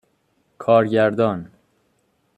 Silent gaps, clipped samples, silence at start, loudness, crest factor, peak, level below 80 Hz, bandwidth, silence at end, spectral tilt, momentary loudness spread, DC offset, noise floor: none; under 0.1%; 0.6 s; -19 LUFS; 18 dB; -4 dBFS; -64 dBFS; 8.6 kHz; 0.9 s; -8 dB/octave; 13 LU; under 0.1%; -66 dBFS